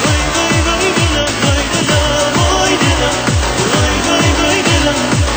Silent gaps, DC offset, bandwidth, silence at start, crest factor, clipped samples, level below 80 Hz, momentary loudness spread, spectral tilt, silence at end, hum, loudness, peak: none; under 0.1%; over 20 kHz; 0 s; 12 dB; under 0.1%; -22 dBFS; 2 LU; -3.5 dB/octave; 0 s; none; -12 LUFS; 0 dBFS